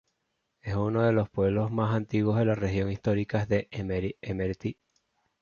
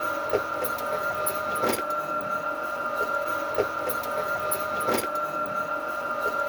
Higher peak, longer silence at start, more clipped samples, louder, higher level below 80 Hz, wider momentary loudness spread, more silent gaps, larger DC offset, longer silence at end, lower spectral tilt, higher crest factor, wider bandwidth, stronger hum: about the same, -12 dBFS vs -10 dBFS; first, 0.65 s vs 0 s; neither; about the same, -28 LUFS vs -27 LUFS; first, -48 dBFS vs -60 dBFS; first, 8 LU vs 3 LU; neither; neither; first, 0.7 s vs 0 s; first, -8.5 dB/octave vs -3 dB/octave; about the same, 16 dB vs 18 dB; second, 7 kHz vs over 20 kHz; neither